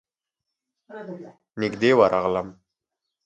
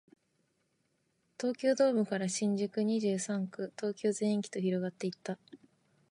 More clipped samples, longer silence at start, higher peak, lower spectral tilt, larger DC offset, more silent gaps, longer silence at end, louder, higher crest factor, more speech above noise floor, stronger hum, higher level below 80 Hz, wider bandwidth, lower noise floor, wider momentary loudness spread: neither; second, 0.9 s vs 1.4 s; first, -4 dBFS vs -16 dBFS; about the same, -6 dB/octave vs -5.5 dB/octave; neither; neither; first, 0.75 s vs 0.55 s; first, -21 LUFS vs -33 LUFS; about the same, 22 dB vs 18 dB; first, 63 dB vs 45 dB; neither; first, -60 dBFS vs -84 dBFS; second, 8.8 kHz vs 11.5 kHz; first, -85 dBFS vs -77 dBFS; first, 23 LU vs 10 LU